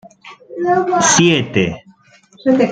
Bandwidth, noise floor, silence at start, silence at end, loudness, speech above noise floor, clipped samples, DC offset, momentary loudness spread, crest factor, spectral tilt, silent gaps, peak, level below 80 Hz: 10 kHz; -48 dBFS; 0.25 s; 0 s; -14 LUFS; 35 dB; under 0.1%; under 0.1%; 14 LU; 16 dB; -3.5 dB/octave; none; 0 dBFS; -50 dBFS